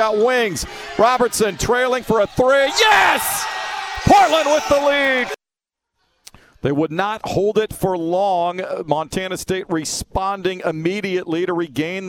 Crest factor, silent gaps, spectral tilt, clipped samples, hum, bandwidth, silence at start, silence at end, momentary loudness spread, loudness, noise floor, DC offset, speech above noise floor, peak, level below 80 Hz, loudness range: 18 dB; none; -3.5 dB/octave; under 0.1%; none; 17.5 kHz; 0 s; 0 s; 11 LU; -18 LUFS; -87 dBFS; under 0.1%; 69 dB; 0 dBFS; -42 dBFS; 7 LU